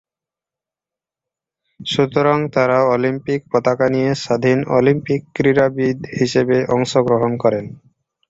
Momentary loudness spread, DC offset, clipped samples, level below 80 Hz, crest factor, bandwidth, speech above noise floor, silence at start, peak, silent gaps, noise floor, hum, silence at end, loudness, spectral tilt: 6 LU; under 0.1%; under 0.1%; -54 dBFS; 16 dB; 8 kHz; 72 dB; 1.8 s; -2 dBFS; none; -88 dBFS; none; 0.55 s; -17 LUFS; -6.5 dB/octave